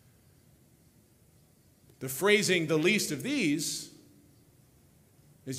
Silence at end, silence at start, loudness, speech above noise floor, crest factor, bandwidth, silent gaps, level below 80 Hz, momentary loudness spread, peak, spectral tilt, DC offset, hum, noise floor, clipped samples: 0 s; 2 s; -28 LUFS; 34 dB; 22 dB; 16 kHz; none; -70 dBFS; 17 LU; -10 dBFS; -3.5 dB/octave; under 0.1%; none; -63 dBFS; under 0.1%